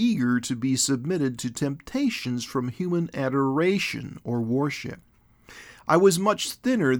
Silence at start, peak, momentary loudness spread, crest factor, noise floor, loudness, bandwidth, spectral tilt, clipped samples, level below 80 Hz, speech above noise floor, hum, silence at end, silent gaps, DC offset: 0 s; -6 dBFS; 10 LU; 20 dB; -51 dBFS; -25 LUFS; over 20 kHz; -5 dB/octave; under 0.1%; -60 dBFS; 26 dB; none; 0 s; none; under 0.1%